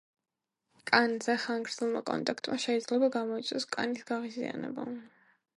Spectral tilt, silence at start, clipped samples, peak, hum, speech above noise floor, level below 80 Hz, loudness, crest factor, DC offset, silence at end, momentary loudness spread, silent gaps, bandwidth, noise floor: -3.5 dB/octave; 0.85 s; under 0.1%; -6 dBFS; none; 43 dB; -80 dBFS; -32 LUFS; 28 dB; under 0.1%; 0.5 s; 11 LU; none; 11.5 kHz; -75 dBFS